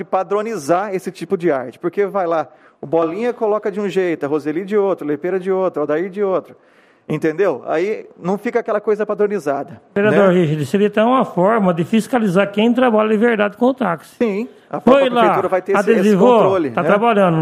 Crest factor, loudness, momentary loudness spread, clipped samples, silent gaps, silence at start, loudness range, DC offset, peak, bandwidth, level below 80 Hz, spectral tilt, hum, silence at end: 16 dB; -17 LUFS; 9 LU; under 0.1%; none; 0 s; 5 LU; under 0.1%; 0 dBFS; 14.5 kHz; -62 dBFS; -7 dB/octave; none; 0 s